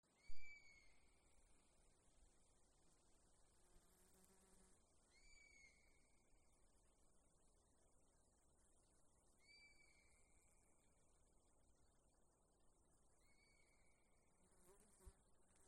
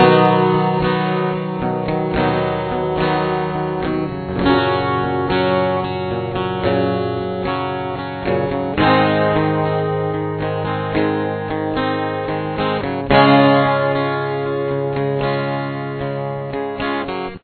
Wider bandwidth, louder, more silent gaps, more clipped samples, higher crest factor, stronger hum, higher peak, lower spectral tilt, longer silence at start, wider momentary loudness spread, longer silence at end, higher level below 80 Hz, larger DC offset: first, 11.5 kHz vs 4.6 kHz; second, -67 LUFS vs -18 LUFS; neither; neither; about the same, 22 dB vs 18 dB; neither; second, -36 dBFS vs 0 dBFS; second, -3 dB/octave vs -10 dB/octave; first, 0.15 s vs 0 s; second, 5 LU vs 9 LU; about the same, 0 s vs 0.05 s; second, -76 dBFS vs -42 dBFS; neither